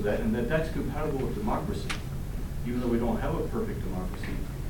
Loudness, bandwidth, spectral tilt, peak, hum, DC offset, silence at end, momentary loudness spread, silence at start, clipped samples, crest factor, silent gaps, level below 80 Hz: -31 LUFS; 17 kHz; -7 dB/octave; -14 dBFS; none; 0.1%; 0 s; 8 LU; 0 s; under 0.1%; 14 dB; none; -36 dBFS